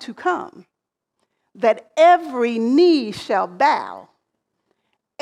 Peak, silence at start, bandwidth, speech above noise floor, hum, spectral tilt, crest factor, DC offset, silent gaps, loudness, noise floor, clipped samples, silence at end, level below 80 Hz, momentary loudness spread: -4 dBFS; 0 s; 11 kHz; 61 dB; none; -5 dB/octave; 16 dB; under 0.1%; none; -18 LUFS; -79 dBFS; under 0.1%; 1.2 s; -70 dBFS; 10 LU